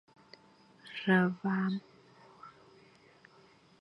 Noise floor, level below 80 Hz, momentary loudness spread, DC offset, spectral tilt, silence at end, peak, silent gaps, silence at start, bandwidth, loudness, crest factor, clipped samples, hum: -62 dBFS; -80 dBFS; 26 LU; under 0.1%; -8 dB/octave; 1.3 s; -14 dBFS; none; 0.85 s; 5.8 kHz; -32 LUFS; 22 dB; under 0.1%; none